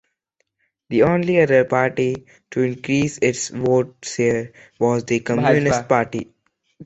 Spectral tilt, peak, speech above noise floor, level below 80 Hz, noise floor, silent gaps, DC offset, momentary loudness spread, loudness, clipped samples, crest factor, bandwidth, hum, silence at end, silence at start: -5.5 dB/octave; -2 dBFS; 53 dB; -54 dBFS; -72 dBFS; none; under 0.1%; 11 LU; -19 LUFS; under 0.1%; 18 dB; 8.2 kHz; none; 0 s; 0.9 s